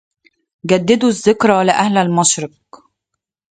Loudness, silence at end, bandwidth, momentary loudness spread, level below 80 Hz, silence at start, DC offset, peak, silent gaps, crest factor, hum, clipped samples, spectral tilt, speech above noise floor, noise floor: -14 LUFS; 1.1 s; 9.4 kHz; 7 LU; -56 dBFS; 0.65 s; under 0.1%; 0 dBFS; none; 16 dB; none; under 0.1%; -4 dB/octave; 64 dB; -78 dBFS